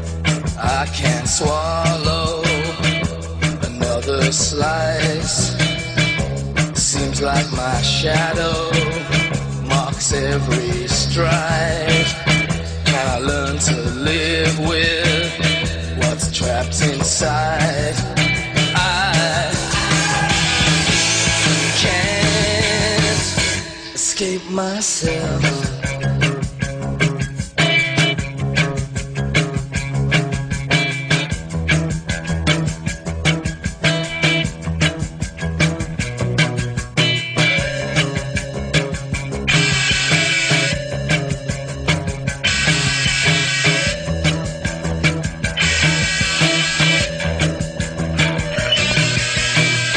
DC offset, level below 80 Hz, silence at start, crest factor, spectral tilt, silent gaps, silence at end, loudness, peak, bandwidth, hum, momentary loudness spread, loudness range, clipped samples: under 0.1%; -32 dBFS; 0 s; 16 dB; -3.5 dB/octave; none; 0 s; -17 LUFS; -2 dBFS; 10.5 kHz; none; 8 LU; 4 LU; under 0.1%